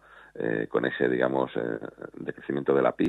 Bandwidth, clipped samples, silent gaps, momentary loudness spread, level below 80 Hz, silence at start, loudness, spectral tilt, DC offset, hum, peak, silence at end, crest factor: 8 kHz; under 0.1%; none; 13 LU; -66 dBFS; 0.15 s; -28 LUFS; -8 dB/octave; under 0.1%; none; -8 dBFS; 0 s; 20 dB